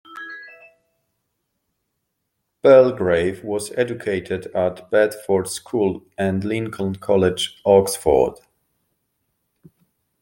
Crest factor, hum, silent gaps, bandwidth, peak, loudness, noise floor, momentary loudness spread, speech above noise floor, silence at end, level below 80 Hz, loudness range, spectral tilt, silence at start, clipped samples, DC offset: 20 dB; none; none; 17 kHz; -2 dBFS; -19 LUFS; -76 dBFS; 12 LU; 57 dB; 1.85 s; -52 dBFS; 3 LU; -5 dB/octave; 0.1 s; under 0.1%; under 0.1%